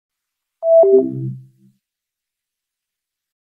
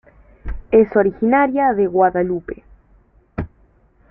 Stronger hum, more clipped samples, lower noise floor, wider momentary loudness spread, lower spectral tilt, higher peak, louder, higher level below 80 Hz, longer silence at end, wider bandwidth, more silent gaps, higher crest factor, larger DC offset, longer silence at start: neither; neither; first, -84 dBFS vs -54 dBFS; second, 17 LU vs 20 LU; first, -13.5 dB/octave vs -11.5 dB/octave; about the same, -2 dBFS vs -2 dBFS; about the same, -14 LUFS vs -16 LUFS; second, -72 dBFS vs -38 dBFS; first, 2 s vs 0.65 s; second, 1.3 kHz vs 3.4 kHz; neither; about the same, 18 dB vs 16 dB; neither; first, 0.6 s vs 0.45 s